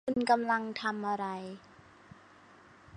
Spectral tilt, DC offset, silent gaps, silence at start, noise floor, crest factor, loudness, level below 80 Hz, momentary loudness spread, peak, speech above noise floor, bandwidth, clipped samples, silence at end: -5 dB/octave; under 0.1%; none; 0.05 s; -58 dBFS; 22 dB; -32 LUFS; -70 dBFS; 16 LU; -12 dBFS; 26 dB; 10.5 kHz; under 0.1%; 0 s